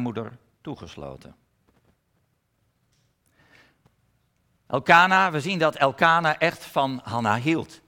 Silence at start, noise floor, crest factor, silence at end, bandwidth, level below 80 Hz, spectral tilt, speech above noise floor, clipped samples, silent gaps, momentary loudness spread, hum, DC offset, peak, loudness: 0 s; -70 dBFS; 24 dB; 0.1 s; 17.5 kHz; -64 dBFS; -5 dB/octave; 48 dB; under 0.1%; none; 23 LU; none; under 0.1%; -2 dBFS; -21 LUFS